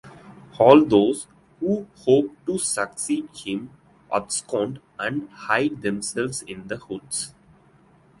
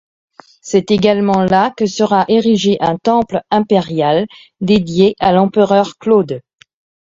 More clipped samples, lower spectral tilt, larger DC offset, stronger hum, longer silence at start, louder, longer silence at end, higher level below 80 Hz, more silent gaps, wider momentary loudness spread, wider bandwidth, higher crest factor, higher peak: neither; second, -4.5 dB/octave vs -6 dB/octave; neither; neither; second, 0.05 s vs 0.65 s; second, -23 LUFS vs -13 LUFS; first, 0.9 s vs 0.7 s; second, -60 dBFS vs -48 dBFS; neither; first, 16 LU vs 5 LU; first, 11.5 kHz vs 7.8 kHz; first, 24 dB vs 14 dB; about the same, 0 dBFS vs 0 dBFS